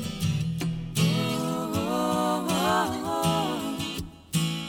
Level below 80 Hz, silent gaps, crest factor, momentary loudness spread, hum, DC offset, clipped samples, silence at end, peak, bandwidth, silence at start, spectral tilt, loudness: -50 dBFS; none; 16 dB; 6 LU; none; under 0.1%; under 0.1%; 0 s; -12 dBFS; 19 kHz; 0 s; -5 dB/octave; -27 LUFS